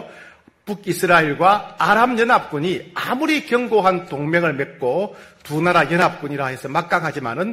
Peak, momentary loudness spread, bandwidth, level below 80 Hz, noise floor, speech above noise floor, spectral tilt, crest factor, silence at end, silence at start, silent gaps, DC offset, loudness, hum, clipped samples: 0 dBFS; 10 LU; 16 kHz; -56 dBFS; -46 dBFS; 27 dB; -5.5 dB/octave; 18 dB; 0 s; 0 s; none; under 0.1%; -18 LUFS; none; under 0.1%